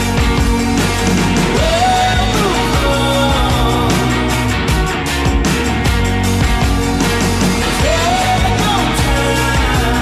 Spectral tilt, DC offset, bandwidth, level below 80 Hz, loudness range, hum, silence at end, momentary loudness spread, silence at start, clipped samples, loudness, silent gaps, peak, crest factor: -4.5 dB/octave; under 0.1%; 15.5 kHz; -20 dBFS; 1 LU; none; 0 s; 2 LU; 0 s; under 0.1%; -14 LUFS; none; -2 dBFS; 10 dB